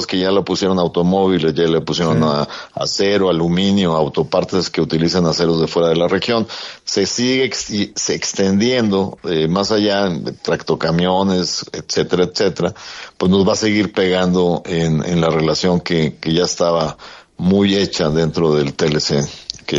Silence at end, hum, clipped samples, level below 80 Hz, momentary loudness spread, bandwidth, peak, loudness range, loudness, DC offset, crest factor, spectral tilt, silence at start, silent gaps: 0 s; none; under 0.1%; -48 dBFS; 6 LU; 7.8 kHz; 0 dBFS; 1 LU; -16 LUFS; under 0.1%; 16 dB; -5 dB/octave; 0 s; none